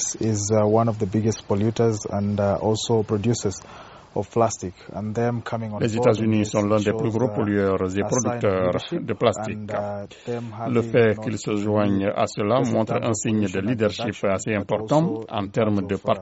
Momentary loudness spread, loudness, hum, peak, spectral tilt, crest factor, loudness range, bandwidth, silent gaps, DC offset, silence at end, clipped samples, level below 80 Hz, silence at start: 9 LU; -23 LUFS; none; -4 dBFS; -6.5 dB/octave; 18 dB; 3 LU; 8 kHz; none; under 0.1%; 0 s; under 0.1%; -56 dBFS; 0 s